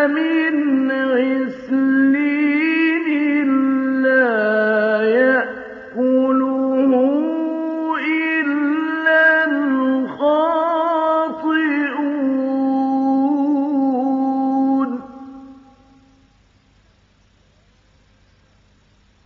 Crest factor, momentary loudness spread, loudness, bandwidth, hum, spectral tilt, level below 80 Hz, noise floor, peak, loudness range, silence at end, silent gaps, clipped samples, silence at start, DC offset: 14 dB; 6 LU; -17 LUFS; 4.8 kHz; none; -7 dB/octave; -64 dBFS; -55 dBFS; -4 dBFS; 5 LU; 3.7 s; none; under 0.1%; 0 s; under 0.1%